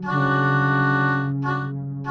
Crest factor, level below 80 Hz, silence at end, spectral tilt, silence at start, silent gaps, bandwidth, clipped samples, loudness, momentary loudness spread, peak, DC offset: 14 dB; -56 dBFS; 0 s; -8.5 dB/octave; 0 s; none; 6.2 kHz; under 0.1%; -21 LUFS; 8 LU; -8 dBFS; under 0.1%